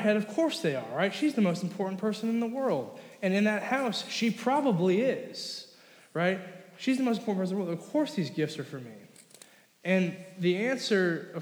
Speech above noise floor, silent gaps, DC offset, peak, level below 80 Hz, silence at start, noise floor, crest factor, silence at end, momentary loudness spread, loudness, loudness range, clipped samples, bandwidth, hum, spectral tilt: 28 dB; none; under 0.1%; -14 dBFS; under -90 dBFS; 0 s; -57 dBFS; 16 dB; 0 s; 11 LU; -30 LUFS; 4 LU; under 0.1%; over 20 kHz; none; -5.5 dB/octave